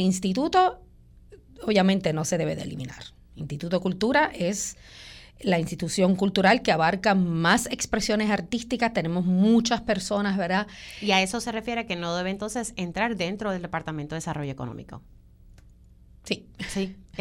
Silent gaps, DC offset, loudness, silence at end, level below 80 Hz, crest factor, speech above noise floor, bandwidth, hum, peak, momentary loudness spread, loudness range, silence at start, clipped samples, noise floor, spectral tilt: none; under 0.1%; -25 LUFS; 0 s; -50 dBFS; 18 dB; 27 dB; 16.5 kHz; none; -8 dBFS; 14 LU; 9 LU; 0 s; under 0.1%; -52 dBFS; -4.5 dB/octave